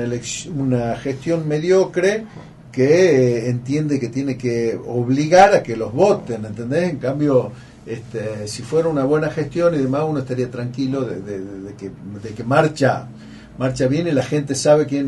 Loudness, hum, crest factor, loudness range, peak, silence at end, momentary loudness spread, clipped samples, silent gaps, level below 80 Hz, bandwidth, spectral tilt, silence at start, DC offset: -19 LUFS; none; 18 dB; 5 LU; -2 dBFS; 0 s; 16 LU; under 0.1%; none; -50 dBFS; 11.5 kHz; -6 dB/octave; 0 s; under 0.1%